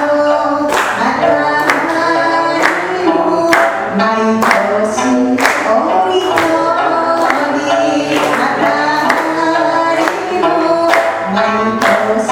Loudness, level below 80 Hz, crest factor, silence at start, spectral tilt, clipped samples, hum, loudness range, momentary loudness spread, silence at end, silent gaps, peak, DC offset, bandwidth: -12 LUFS; -50 dBFS; 12 dB; 0 s; -4 dB/octave; under 0.1%; none; 1 LU; 2 LU; 0 s; none; 0 dBFS; under 0.1%; 18.5 kHz